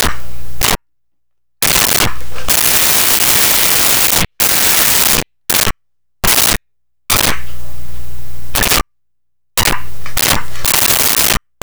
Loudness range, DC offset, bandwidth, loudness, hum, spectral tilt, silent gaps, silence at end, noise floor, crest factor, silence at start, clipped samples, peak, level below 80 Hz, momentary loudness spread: 8 LU; under 0.1%; over 20 kHz; -10 LUFS; none; -1 dB/octave; none; 0 s; -80 dBFS; 14 dB; 0 s; under 0.1%; 0 dBFS; -30 dBFS; 11 LU